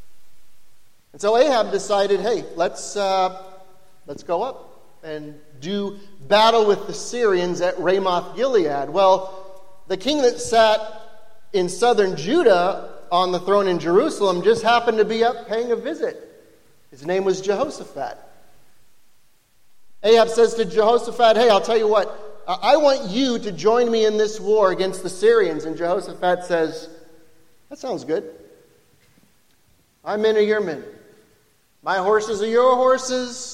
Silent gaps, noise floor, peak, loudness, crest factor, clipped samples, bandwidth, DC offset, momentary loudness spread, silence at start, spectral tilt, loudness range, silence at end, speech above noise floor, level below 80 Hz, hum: none; -61 dBFS; -4 dBFS; -19 LUFS; 18 dB; under 0.1%; 13 kHz; 1%; 14 LU; 0 s; -4 dB/octave; 9 LU; 0 s; 42 dB; -62 dBFS; none